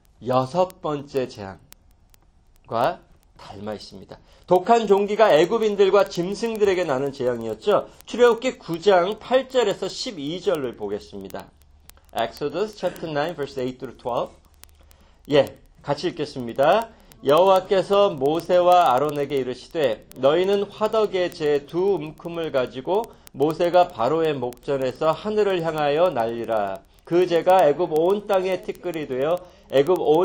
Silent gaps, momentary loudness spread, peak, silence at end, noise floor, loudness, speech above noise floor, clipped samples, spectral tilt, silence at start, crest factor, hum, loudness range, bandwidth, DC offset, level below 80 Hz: none; 13 LU; -4 dBFS; 0 s; -55 dBFS; -22 LUFS; 34 dB; under 0.1%; -5.5 dB/octave; 0.2 s; 18 dB; none; 9 LU; 17 kHz; under 0.1%; -54 dBFS